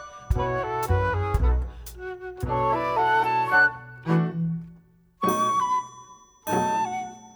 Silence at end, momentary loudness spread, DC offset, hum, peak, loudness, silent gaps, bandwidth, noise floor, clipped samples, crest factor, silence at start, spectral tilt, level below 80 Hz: 0.05 s; 15 LU; under 0.1%; none; -8 dBFS; -25 LUFS; none; over 20 kHz; -54 dBFS; under 0.1%; 18 dB; 0 s; -6 dB/octave; -34 dBFS